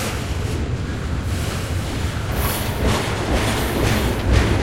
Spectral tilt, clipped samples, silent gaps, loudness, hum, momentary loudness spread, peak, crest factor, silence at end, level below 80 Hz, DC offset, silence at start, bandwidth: -5 dB/octave; under 0.1%; none; -22 LUFS; none; 6 LU; -4 dBFS; 16 dB; 0 s; -26 dBFS; 0.7%; 0 s; 16 kHz